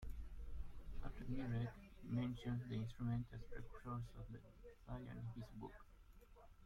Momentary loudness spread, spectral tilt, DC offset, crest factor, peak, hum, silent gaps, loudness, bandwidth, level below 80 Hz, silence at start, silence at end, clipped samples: 19 LU; -8.5 dB/octave; under 0.1%; 16 dB; -32 dBFS; none; none; -50 LUFS; 11 kHz; -56 dBFS; 0 s; 0 s; under 0.1%